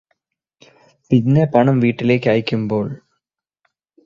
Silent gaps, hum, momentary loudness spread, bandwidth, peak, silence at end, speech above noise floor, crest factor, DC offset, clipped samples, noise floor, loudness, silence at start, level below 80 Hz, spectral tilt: none; none; 9 LU; 7 kHz; 0 dBFS; 1.1 s; 62 dB; 18 dB; under 0.1%; under 0.1%; -77 dBFS; -17 LUFS; 1.1 s; -56 dBFS; -9 dB/octave